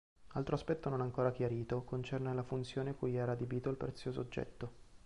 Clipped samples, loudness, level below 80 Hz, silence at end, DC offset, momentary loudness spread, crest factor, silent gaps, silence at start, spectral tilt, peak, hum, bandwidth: under 0.1%; -39 LUFS; -60 dBFS; 0.1 s; under 0.1%; 7 LU; 18 dB; none; 0.2 s; -8 dB/octave; -20 dBFS; none; 11 kHz